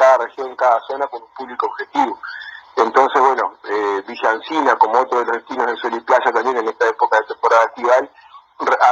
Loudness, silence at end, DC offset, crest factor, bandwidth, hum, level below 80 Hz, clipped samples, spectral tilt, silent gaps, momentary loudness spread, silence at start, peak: -17 LUFS; 0 s; under 0.1%; 16 dB; 7.8 kHz; none; -68 dBFS; under 0.1%; -2.5 dB/octave; none; 11 LU; 0 s; 0 dBFS